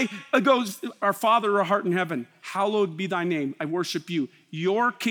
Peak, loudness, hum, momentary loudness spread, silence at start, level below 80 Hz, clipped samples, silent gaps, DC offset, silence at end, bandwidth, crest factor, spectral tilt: -6 dBFS; -25 LUFS; none; 9 LU; 0 s; -86 dBFS; under 0.1%; none; under 0.1%; 0 s; over 20 kHz; 18 dB; -5 dB/octave